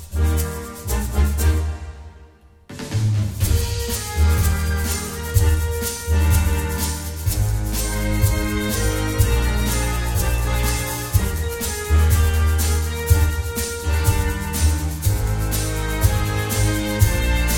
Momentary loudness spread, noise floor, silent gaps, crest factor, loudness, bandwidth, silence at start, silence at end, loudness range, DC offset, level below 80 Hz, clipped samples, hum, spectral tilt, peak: 6 LU; -47 dBFS; none; 16 dB; -21 LUFS; 18 kHz; 0 s; 0 s; 3 LU; under 0.1%; -22 dBFS; under 0.1%; none; -4.5 dB/octave; -2 dBFS